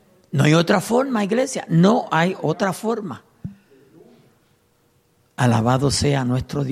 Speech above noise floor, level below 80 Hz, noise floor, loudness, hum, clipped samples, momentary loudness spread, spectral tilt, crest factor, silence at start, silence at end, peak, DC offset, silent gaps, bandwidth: 43 dB; -48 dBFS; -61 dBFS; -19 LUFS; none; under 0.1%; 18 LU; -6 dB/octave; 18 dB; 0.35 s; 0 s; -4 dBFS; under 0.1%; none; 15 kHz